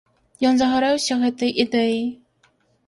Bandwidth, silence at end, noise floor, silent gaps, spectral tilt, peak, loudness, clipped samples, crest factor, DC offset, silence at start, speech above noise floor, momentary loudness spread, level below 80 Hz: 11.5 kHz; 0.75 s; -62 dBFS; none; -3.5 dB/octave; -4 dBFS; -20 LUFS; under 0.1%; 18 dB; under 0.1%; 0.4 s; 43 dB; 5 LU; -58 dBFS